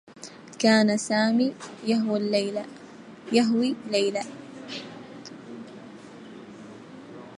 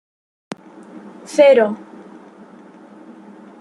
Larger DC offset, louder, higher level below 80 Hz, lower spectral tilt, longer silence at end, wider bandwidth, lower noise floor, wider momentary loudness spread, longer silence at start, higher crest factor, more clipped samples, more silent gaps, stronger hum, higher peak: neither; second, -24 LUFS vs -14 LUFS; about the same, -76 dBFS vs -74 dBFS; about the same, -4.5 dB/octave vs -4.5 dB/octave; second, 0 s vs 1.85 s; about the same, 11 kHz vs 11.5 kHz; about the same, -44 dBFS vs -42 dBFS; second, 23 LU vs 28 LU; second, 0.1 s vs 1.3 s; about the same, 22 dB vs 18 dB; neither; neither; neither; second, -6 dBFS vs -2 dBFS